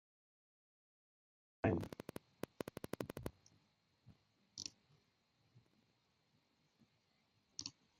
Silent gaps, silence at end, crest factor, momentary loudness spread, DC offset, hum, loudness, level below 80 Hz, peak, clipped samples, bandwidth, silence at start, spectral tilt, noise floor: none; 0.3 s; 30 dB; 14 LU; under 0.1%; none; -47 LUFS; -72 dBFS; -20 dBFS; under 0.1%; 15.5 kHz; 1.65 s; -5 dB/octave; -80 dBFS